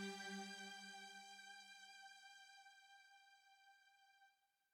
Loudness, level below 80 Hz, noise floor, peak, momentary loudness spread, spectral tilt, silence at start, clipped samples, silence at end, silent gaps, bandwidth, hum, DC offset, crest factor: -56 LUFS; under -90 dBFS; -78 dBFS; -38 dBFS; 18 LU; -2.5 dB/octave; 0 s; under 0.1%; 0.4 s; none; 17.5 kHz; none; under 0.1%; 20 dB